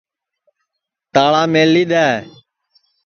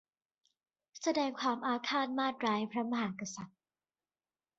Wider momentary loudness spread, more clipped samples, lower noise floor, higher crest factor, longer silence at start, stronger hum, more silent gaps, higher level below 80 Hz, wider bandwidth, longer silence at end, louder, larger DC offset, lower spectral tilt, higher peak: second, 6 LU vs 10 LU; neither; second, -78 dBFS vs under -90 dBFS; about the same, 16 dB vs 18 dB; first, 1.15 s vs 0.95 s; neither; neither; first, -60 dBFS vs -80 dBFS; second, 6.8 kHz vs 8 kHz; second, 0.75 s vs 1.1 s; first, -14 LUFS vs -35 LUFS; neither; first, -5.5 dB/octave vs -2.5 dB/octave; first, 0 dBFS vs -20 dBFS